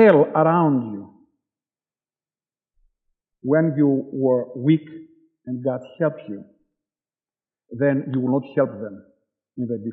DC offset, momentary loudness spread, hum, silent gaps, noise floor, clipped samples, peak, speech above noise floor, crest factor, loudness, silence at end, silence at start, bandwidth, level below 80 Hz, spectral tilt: under 0.1%; 19 LU; none; none; under -90 dBFS; under 0.1%; -2 dBFS; over 70 dB; 20 dB; -21 LUFS; 0 s; 0 s; 4.3 kHz; -76 dBFS; -8 dB/octave